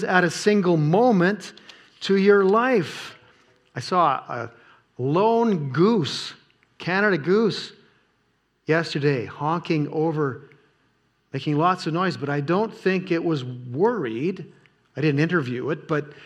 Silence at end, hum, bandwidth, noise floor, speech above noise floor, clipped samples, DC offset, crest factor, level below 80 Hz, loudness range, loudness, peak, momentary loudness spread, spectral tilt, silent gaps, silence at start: 0 s; none; 12 kHz; -68 dBFS; 46 dB; under 0.1%; under 0.1%; 20 dB; -74 dBFS; 4 LU; -22 LUFS; -2 dBFS; 15 LU; -6.5 dB/octave; none; 0 s